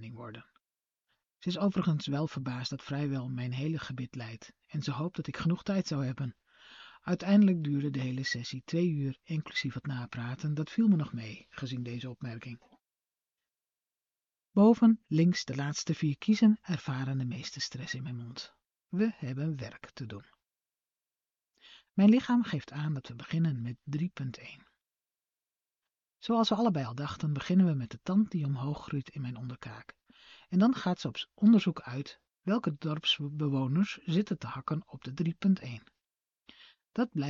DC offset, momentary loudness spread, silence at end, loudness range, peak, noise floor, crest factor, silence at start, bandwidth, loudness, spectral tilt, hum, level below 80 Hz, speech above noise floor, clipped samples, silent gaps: under 0.1%; 18 LU; 0 s; 8 LU; -12 dBFS; under -90 dBFS; 20 dB; 0 s; 7.4 kHz; -31 LUFS; -6 dB/octave; none; -68 dBFS; over 59 dB; under 0.1%; none